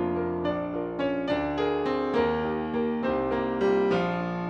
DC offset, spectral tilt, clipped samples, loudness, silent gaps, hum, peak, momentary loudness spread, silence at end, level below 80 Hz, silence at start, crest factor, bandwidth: under 0.1%; -7.5 dB/octave; under 0.1%; -27 LUFS; none; none; -14 dBFS; 5 LU; 0 s; -50 dBFS; 0 s; 14 dB; 7.2 kHz